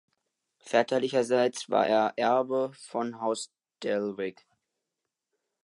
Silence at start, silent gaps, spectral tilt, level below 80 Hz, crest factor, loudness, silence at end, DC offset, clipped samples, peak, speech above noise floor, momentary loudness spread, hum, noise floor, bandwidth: 0.65 s; none; -4 dB/octave; -80 dBFS; 20 dB; -28 LUFS; 1.35 s; under 0.1%; under 0.1%; -10 dBFS; 59 dB; 10 LU; none; -86 dBFS; 11.5 kHz